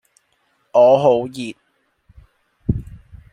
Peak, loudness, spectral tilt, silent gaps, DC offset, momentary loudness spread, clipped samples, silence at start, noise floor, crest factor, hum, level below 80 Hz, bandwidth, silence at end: -2 dBFS; -17 LUFS; -7.5 dB/octave; none; under 0.1%; 17 LU; under 0.1%; 0.75 s; -64 dBFS; 18 dB; none; -42 dBFS; 11 kHz; 0.35 s